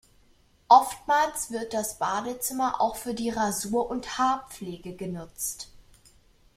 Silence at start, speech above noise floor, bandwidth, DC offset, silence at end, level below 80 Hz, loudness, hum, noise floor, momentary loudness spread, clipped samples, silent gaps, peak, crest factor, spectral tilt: 0.7 s; 34 dB; 16 kHz; under 0.1%; 0.75 s; -58 dBFS; -26 LUFS; none; -61 dBFS; 17 LU; under 0.1%; none; -4 dBFS; 22 dB; -3 dB/octave